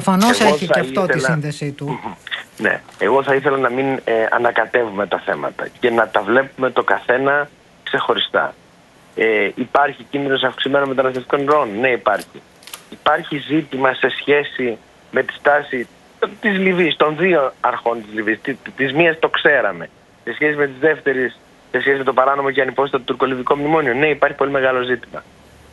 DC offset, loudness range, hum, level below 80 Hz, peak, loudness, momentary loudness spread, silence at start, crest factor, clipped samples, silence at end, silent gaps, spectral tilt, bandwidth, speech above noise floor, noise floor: under 0.1%; 2 LU; none; -58 dBFS; 0 dBFS; -17 LUFS; 10 LU; 0 s; 18 dB; under 0.1%; 0.5 s; none; -5 dB/octave; 12 kHz; 31 dB; -48 dBFS